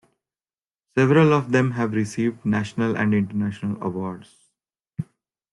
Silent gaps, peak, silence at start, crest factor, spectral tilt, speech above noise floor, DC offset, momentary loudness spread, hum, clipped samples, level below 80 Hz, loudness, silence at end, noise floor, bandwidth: none; -6 dBFS; 0.95 s; 18 dB; -7.5 dB/octave; over 69 dB; under 0.1%; 18 LU; none; under 0.1%; -60 dBFS; -22 LUFS; 0.5 s; under -90 dBFS; 11.5 kHz